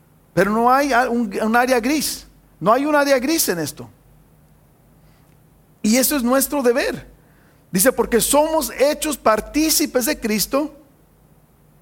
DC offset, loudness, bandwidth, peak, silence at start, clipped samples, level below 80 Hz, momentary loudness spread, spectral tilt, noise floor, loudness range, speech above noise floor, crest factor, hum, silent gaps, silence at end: under 0.1%; -18 LUFS; 17 kHz; -2 dBFS; 0.35 s; under 0.1%; -46 dBFS; 9 LU; -3 dB/octave; -53 dBFS; 4 LU; 35 dB; 18 dB; none; none; 1.1 s